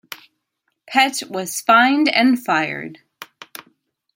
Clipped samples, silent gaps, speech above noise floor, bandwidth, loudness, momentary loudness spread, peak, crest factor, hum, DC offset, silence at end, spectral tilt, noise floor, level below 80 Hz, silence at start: under 0.1%; none; 56 dB; 16.5 kHz; -17 LUFS; 24 LU; -2 dBFS; 18 dB; none; under 0.1%; 0.9 s; -2.5 dB/octave; -73 dBFS; -72 dBFS; 0.1 s